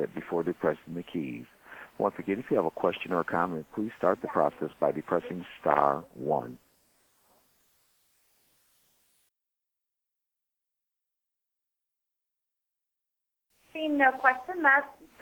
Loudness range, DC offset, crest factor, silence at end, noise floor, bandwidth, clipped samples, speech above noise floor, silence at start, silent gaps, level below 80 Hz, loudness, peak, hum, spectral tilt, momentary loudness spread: 6 LU; under 0.1%; 24 dB; 0.15 s; -87 dBFS; 20 kHz; under 0.1%; 58 dB; 0 s; none; -72 dBFS; -29 LUFS; -6 dBFS; none; -7 dB/octave; 16 LU